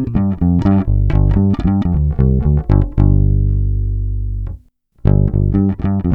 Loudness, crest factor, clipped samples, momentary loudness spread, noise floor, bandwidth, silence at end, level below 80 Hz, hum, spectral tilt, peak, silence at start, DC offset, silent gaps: -15 LUFS; 12 dB; under 0.1%; 8 LU; -42 dBFS; 3.9 kHz; 0 s; -18 dBFS; 50 Hz at -20 dBFS; -11.5 dB/octave; 0 dBFS; 0 s; under 0.1%; none